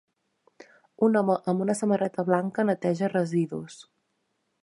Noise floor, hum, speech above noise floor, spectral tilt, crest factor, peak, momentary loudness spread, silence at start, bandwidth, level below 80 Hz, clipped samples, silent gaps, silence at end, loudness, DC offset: -76 dBFS; none; 50 dB; -7 dB/octave; 20 dB; -8 dBFS; 5 LU; 1 s; 11.5 kHz; -76 dBFS; under 0.1%; none; 0.8 s; -26 LUFS; under 0.1%